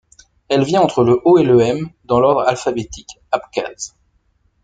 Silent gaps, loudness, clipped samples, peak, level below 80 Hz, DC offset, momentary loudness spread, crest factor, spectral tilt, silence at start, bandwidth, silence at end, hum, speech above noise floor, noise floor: none; -16 LUFS; under 0.1%; -2 dBFS; -50 dBFS; under 0.1%; 17 LU; 14 dB; -6 dB/octave; 0.5 s; 9.2 kHz; 0.75 s; none; 45 dB; -61 dBFS